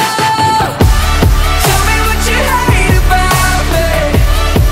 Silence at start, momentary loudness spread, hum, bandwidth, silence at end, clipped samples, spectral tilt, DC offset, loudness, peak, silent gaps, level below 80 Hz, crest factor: 0 s; 2 LU; none; 16.5 kHz; 0 s; under 0.1%; -4 dB/octave; under 0.1%; -11 LUFS; 0 dBFS; none; -12 dBFS; 10 dB